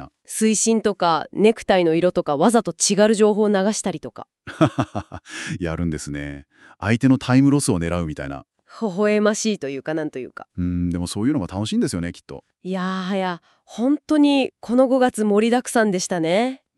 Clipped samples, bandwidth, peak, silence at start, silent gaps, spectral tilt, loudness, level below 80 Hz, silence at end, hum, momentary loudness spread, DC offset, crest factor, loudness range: under 0.1%; 13 kHz; -4 dBFS; 0 s; none; -5 dB/octave; -20 LUFS; -48 dBFS; 0.2 s; none; 16 LU; under 0.1%; 16 dB; 7 LU